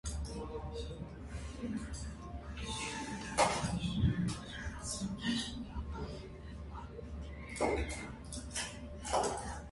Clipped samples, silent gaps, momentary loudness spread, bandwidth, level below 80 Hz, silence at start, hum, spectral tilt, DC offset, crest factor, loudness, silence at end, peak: under 0.1%; none; 13 LU; 11.5 kHz; -46 dBFS; 0.05 s; none; -4.5 dB/octave; under 0.1%; 22 dB; -39 LUFS; 0 s; -16 dBFS